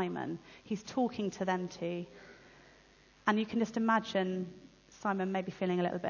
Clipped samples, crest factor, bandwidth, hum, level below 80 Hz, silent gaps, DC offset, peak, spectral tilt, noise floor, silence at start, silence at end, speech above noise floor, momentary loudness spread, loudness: under 0.1%; 22 dB; 7.2 kHz; none; -70 dBFS; none; under 0.1%; -14 dBFS; -6 dB/octave; -62 dBFS; 0 s; 0 s; 28 dB; 12 LU; -35 LUFS